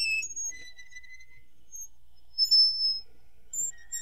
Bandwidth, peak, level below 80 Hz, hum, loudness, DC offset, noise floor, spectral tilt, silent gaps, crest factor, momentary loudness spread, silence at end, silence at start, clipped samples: 16 kHz; -14 dBFS; -64 dBFS; none; -25 LUFS; 0.7%; -61 dBFS; 4 dB/octave; none; 16 dB; 27 LU; 0 s; 0 s; under 0.1%